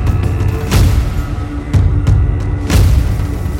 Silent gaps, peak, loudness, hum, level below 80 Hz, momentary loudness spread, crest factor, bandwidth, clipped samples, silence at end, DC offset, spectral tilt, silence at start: none; 0 dBFS; -14 LUFS; none; -16 dBFS; 7 LU; 12 dB; 16.5 kHz; under 0.1%; 0 s; under 0.1%; -6.5 dB/octave; 0 s